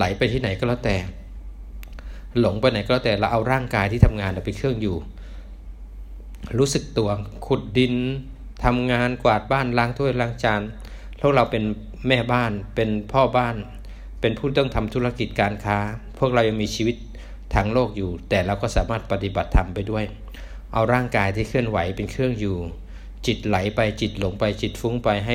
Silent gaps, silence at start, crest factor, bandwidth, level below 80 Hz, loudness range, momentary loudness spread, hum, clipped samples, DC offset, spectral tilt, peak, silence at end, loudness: none; 0 s; 22 dB; 16 kHz; -34 dBFS; 3 LU; 20 LU; none; under 0.1%; under 0.1%; -6 dB/octave; 0 dBFS; 0 s; -23 LUFS